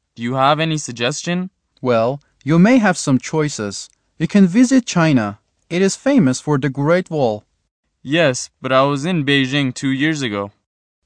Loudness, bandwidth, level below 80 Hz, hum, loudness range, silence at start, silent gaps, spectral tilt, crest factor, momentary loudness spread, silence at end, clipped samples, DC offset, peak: -17 LUFS; 10 kHz; -60 dBFS; none; 2 LU; 0.2 s; 7.71-7.83 s; -5.5 dB/octave; 16 dB; 12 LU; 0.55 s; under 0.1%; under 0.1%; -2 dBFS